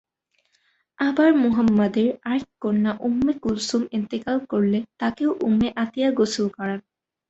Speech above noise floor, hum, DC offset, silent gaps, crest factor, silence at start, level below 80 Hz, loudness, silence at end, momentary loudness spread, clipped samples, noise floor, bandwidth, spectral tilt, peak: 48 dB; none; under 0.1%; none; 16 dB; 1 s; -56 dBFS; -22 LUFS; 0.5 s; 8 LU; under 0.1%; -69 dBFS; 8.2 kHz; -6 dB/octave; -6 dBFS